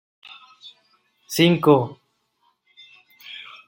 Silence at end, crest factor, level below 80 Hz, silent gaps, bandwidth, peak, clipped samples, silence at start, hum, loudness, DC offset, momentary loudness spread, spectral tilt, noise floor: 0.25 s; 22 dB; -66 dBFS; none; 16.5 kHz; -2 dBFS; under 0.1%; 1.3 s; none; -19 LUFS; under 0.1%; 27 LU; -5.5 dB/octave; -67 dBFS